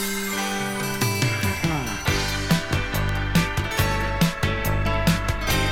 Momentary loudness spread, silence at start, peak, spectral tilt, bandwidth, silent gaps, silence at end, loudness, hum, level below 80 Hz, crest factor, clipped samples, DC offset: 3 LU; 0 s; -6 dBFS; -4.5 dB/octave; 18 kHz; none; 0 s; -23 LUFS; none; -32 dBFS; 18 dB; under 0.1%; under 0.1%